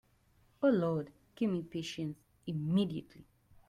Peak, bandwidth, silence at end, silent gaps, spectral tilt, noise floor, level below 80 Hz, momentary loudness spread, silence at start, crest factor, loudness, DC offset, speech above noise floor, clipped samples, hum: -18 dBFS; 13.5 kHz; 0.45 s; none; -7.5 dB/octave; -69 dBFS; -68 dBFS; 13 LU; 0.6 s; 18 dB; -35 LUFS; under 0.1%; 35 dB; under 0.1%; none